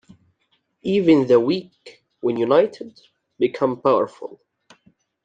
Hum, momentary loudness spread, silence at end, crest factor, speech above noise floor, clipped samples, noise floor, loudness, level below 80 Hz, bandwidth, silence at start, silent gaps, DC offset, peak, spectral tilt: none; 21 LU; 0.9 s; 18 dB; 49 dB; under 0.1%; -68 dBFS; -20 LUFS; -68 dBFS; 8.8 kHz; 0.85 s; none; under 0.1%; -4 dBFS; -7.5 dB/octave